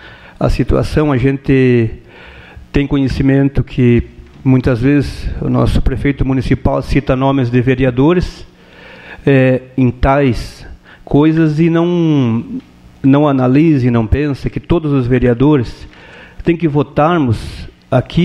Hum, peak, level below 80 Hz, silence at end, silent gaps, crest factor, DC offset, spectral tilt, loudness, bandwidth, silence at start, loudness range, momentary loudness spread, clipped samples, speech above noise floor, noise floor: none; 0 dBFS; -26 dBFS; 0 s; none; 12 dB; under 0.1%; -8.5 dB/octave; -13 LUFS; 10.5 kHz; 0 s; 2 LU; 9 LU; under 0.1%; 26 dB; -37 dBFS